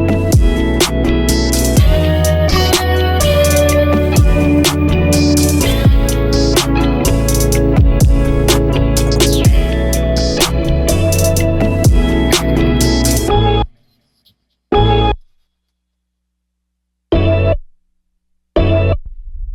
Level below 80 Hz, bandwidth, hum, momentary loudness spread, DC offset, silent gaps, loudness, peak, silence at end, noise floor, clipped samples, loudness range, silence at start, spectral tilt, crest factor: -18 dBFS; 17.5 kHz; none; 4 LU; under 0.1%; none; -13 LUFS; 0 dBFS; 0 s; -71 dBFS; under 0.1%; 7 LU; 0 s; -5 dB/octave; 12 dB